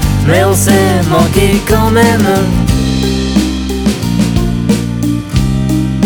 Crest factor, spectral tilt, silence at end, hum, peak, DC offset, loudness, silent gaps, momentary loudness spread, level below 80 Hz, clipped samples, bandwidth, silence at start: 10 dB; -5.5 dB/octave; 0 s; none; 0 dBFS; under 0.1%; -11 LUFS; none; 5 LU; -20 dBFS; under 0.1%; 19.5 kHz; 0 s